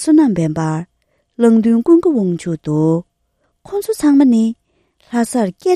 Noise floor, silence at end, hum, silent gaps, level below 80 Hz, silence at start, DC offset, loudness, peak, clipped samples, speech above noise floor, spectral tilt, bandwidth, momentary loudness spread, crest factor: -65 dBFS; 0 s; none; none; -54 dBFS; 0 s; under 0.1%; -15 LUFS; 0 dBFS; under 0.1%; 52 dB; -7 dB/octave; 13.5 kHz; 11 LU; 14 dB